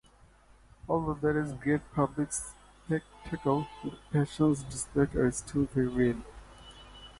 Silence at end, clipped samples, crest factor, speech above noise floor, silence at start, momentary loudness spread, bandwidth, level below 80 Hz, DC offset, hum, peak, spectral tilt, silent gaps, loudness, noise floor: 0.05 s; under 0.1%; 18 dB; 29 dB; 0.85 s; 21 LU; 11.5 kHz; -50 dBFS; under 0.1%; none; -14 dBFS; -6 dB/octave; none; -31 LUFS; -59 dBFS